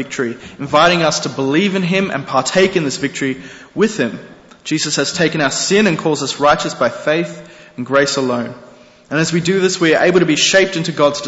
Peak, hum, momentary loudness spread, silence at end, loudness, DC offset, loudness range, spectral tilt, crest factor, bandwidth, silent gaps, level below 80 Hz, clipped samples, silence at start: -2 dBFS; none; 11 LU; 0 s; -15 LUFS; under 0.1%; 3 LU; -4 dB/octave; 14 dB; 8.2 kHz; none; -52 dBFS; under 0.1%; 0 s